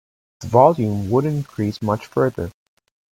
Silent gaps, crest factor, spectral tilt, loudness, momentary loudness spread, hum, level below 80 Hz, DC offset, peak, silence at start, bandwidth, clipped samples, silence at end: none; 20 dB; -8 dB/octave; -19 LUFS; 14 LU; none; -52 dBFS; under 0.1%; 0 dBFS; 0.4 s; 16.5 kHz; under 0.1%; 0.6 s